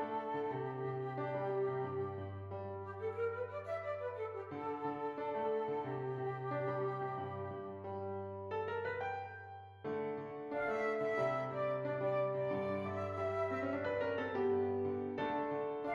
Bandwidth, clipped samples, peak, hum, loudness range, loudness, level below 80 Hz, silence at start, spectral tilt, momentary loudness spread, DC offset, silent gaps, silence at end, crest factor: 7 kHz; under 0.1%; -24 dBFS; none; 5 LU; -40 LUFS; -78 dBFS; 0 s; -8 dB/octave; 8 LU; under 0.1%; none; 0 s; 14 dB